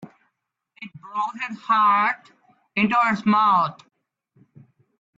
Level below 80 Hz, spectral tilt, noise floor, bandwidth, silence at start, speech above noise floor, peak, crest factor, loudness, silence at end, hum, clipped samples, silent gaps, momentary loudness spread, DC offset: -70 dBFS; -6 dB/octave; -76 dBFS; 7.8 kHz; 0 s; 56 dB; -8 dBFS; 16 dB; -21 LUFS; 1.45 s; none; under 0.1%; none; 16 LU; under 0.1%